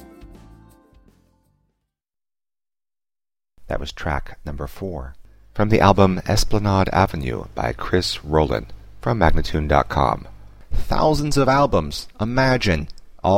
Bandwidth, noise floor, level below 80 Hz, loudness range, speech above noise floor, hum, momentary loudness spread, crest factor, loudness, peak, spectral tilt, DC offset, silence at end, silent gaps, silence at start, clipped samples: 16 kHz; under -90 dBFS; -30 dBFS; 13 LU; over 71 dB; none; 15 LU; 20 dB; -20 LUFS; 0 dBFS; -6 dB/octave; under 0.1%; 0 s; none; 0 s; under 0.1%